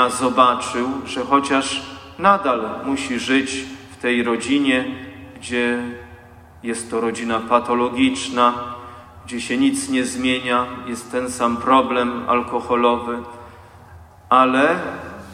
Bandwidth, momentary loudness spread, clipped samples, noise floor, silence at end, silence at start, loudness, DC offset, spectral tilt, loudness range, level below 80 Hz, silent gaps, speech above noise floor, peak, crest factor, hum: 13.5 kHz; 16 LU; under 0.1%; -43 dBFS; 0 s; 0 s; -19 LUFS; under 0.1%; -3.5 dB/octave; 3 LU; -54 dBFS; none; 24 dB; -2 dBFS; 20 dB; none